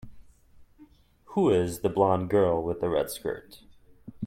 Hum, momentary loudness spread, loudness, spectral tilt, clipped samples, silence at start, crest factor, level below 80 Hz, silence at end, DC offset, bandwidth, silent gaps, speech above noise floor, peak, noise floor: none; 10 LU; -26 LUFS; -6.5 dB/octave; under 0.1%; 0.05 s; 20 dB; -56 dBFS; 0 s; under 0.1%; 16.5 kHz; none; 31 dB; -8 dBFS; -57 dBFS